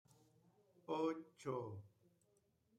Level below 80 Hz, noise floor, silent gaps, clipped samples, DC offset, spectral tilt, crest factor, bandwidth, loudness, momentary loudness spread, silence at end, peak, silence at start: -90 dBFS; -80 dBFS; none; under 0.1%; under 0.1%; -7 dB/octave; 20 dB; 12 kHz; -46 LUFS; 15 LU; 0.9 s; -30 dBFS; 0.9 s